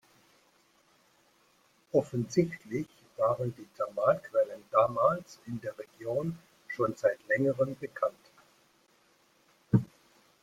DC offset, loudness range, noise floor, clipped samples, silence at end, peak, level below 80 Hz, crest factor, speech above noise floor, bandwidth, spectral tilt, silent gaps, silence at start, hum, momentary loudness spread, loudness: under 0.1%; 3 LU; -67 dBFS; under 0.1%; 0.55 s; -10 dBFS; -68 dBFS; 22 dB; 37 dB; 15 kHz; -7.5 dB/octave; none; 1.95 s; none; 12 LU; -31 LUFS